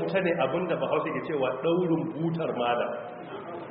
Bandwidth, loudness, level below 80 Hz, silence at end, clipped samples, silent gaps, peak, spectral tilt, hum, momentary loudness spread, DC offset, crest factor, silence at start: 4.5 kHz; -28 LUFS; -68 dBFS; 0 s; under 0.1%; none; -12 dBFS; -5 dB/octave; none; 12 LU; under 0.1%; 16 dB; 0 s